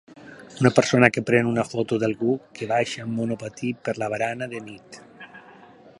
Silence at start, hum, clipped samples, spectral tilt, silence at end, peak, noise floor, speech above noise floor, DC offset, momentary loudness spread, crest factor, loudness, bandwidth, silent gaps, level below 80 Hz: 0.1 s; none; under 0.1%; -5.5 dB/octave; 0.5 s; 0 dBFS; -49 dBFS; 26 dB; under 0.1%; 25 LU; 24 dB; -23 LUFS; 11.5 kHz; none; -62 dBFS